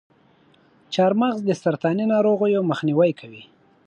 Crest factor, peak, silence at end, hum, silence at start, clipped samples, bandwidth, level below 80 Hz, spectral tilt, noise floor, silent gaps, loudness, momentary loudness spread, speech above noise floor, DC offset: 16 dB; -6 dBFS; 0.45 s; none; 0.9 s; under 0.1%; 9.2 kHz; -72 dBFS; -7 dB/octave; -57 dBFS; none; -21 LUFS; 6 LU; 37 dB; under 0.1%